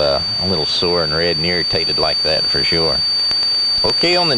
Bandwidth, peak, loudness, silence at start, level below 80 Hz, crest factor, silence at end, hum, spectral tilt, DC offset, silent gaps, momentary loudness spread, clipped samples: 15.5 kHz; 0 dBFS; -14 LUFS; 0 s; -40 dBFS; 16 dB; 0 s; none; -3.5 dB/octave; under 0.1%; none; 2 LU; under 0.1%